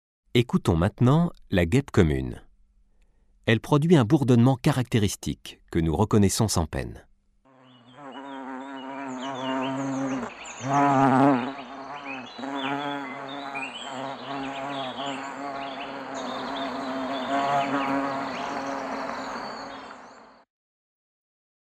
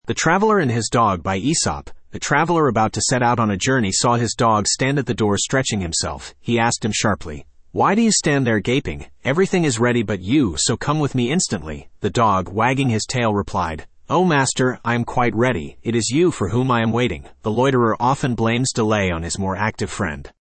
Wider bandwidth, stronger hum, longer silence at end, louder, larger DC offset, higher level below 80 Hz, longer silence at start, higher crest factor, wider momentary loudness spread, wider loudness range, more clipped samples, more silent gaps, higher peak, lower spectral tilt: first, 15 kHz vs 8.8 kHz; neither; first, 1.45 s vs 0.3 s; second, -26 LUFS vs -19 LUFS; neither; about the same, -46 dBFS vs -44 dBFS; first, 0.35 s vs 0.05 s; about the same, 20 dB vs 16 dB; first, 17 LU vs 8 LU; first, 10 LU vs 2 LU; neither; neither; about the same, -6 dBFS vs -4 dBFS; first, -6 dB/octave vs -4.5 dB/octave